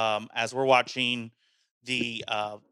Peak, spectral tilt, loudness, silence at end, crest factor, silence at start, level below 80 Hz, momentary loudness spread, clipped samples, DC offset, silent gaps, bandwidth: -6 dBFS; -3.5 dB/octave; -27 LUFS; 0.15 s; 24 dB; 0 s; -74 dBFS; 10 LU; under 0.1%; under 0.1%; 1.71-1.81 s; 12.5 kHz